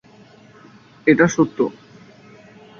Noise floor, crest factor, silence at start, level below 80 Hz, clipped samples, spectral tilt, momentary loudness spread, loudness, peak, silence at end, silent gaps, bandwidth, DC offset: -47 dBFS; 20 dB; 1.05 s; -58 dBFS; under 0.1%; -6 dB/octave; 9 LU; -18 LUFS; -2 dBFS; 1.1 s; none; 7.4 kHz; under 0.1%